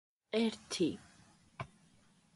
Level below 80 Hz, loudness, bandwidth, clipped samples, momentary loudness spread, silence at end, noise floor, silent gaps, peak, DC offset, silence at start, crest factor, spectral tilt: -72 dBFS; -36 LUFS; 11.5 kHz; under 0.1%; 16 LU; 0.7 s; -68 dBFS; none; -20 dBFS; under 0.1%; 0.35 s; 20 dB; -4.5 dB/octave